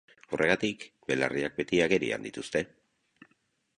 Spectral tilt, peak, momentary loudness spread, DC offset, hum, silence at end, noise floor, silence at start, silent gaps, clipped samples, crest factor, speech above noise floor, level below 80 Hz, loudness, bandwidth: -4.5 dB/octave; -8 dBFS; 11 LU; under 0.1%; none; 1.1 s; -73 dBFS; 0.3 s; none; under 0.1%; 22 dB; 44 dB; -62 dBFS; -29 LUFS; 11.5 kHz